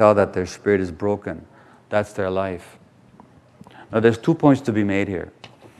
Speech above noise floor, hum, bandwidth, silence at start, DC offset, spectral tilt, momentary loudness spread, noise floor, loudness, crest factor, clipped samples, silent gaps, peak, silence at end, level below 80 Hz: 30 dB; none; 12 kHz; 0 s; under 0.1%; -7.5 dB/octave; 14 LU; -50 dBFS; -21 LUFS; 20 dB; under 0.1%; none; 0 dBFS; 0.15 s; -58 dBFS